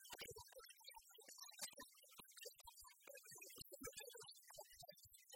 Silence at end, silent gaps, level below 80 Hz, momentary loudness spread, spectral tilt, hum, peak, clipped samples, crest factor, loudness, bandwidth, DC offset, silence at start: 0 s; none; -82 dBFS; 8 LU; -1 dB/octave; none; -36 dBFS; under 0.1%; 24 dB; -58 LUFS; 17 kHz; under 0.1%; 0 s